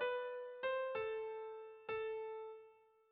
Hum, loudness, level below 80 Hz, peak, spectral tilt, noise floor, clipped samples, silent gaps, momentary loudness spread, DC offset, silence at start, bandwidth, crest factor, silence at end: none; -44 LUFS; -80 dBFS; -30 dBFS; 0 dB/octave; -66 dBFS; under 0.1%; none; 11 LU; under 0.1%; 0 s; 4.8 kHz; 14 dB; 0.35 s